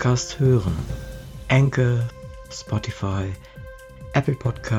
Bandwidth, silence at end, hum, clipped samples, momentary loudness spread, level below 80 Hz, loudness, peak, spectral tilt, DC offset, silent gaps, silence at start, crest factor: 10.5 kHz; 0 s; none; under 0.1%; 20 LU; -40 dBFS; -23 LUFS; -6 dBFS; -6.5 dB/octave; under 0.1%; none; 0 s; 18 dB